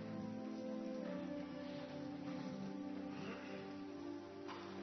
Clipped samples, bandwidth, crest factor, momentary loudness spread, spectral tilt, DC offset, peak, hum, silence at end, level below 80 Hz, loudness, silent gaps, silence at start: under 0.1%; 6.2 kHz; 14 dB; 4 LU; -5.5 dB/octave; under 0.1%; -34 dBFS; none; 0 s; -82 dBFS; -48 LUFS; none; 0 s